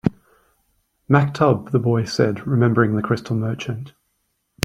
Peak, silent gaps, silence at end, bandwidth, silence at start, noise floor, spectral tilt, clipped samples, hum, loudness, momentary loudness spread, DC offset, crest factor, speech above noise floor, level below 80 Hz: 0 dBFS; none; 0.75 s; 10 kHz; 0.05 s; -71 dBFS; -7 dB/octave; under 0.1%; none; -20 LUFS; 11 LU; under 0.1%; 20 dB; 52 dB; -54 dBFS